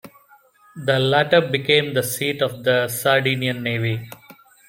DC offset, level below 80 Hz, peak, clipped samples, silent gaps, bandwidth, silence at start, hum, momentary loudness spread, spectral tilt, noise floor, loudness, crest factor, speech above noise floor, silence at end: under 0.1%; -60 dBFS; -2 dBFS; under 0.1%; none; 16.5 kHz; 0.05 s; none; 7 LU; -4.5 dB/octave; -53 dBFS; -20 LUFS; 20 dB; 34 dB; 0.35 s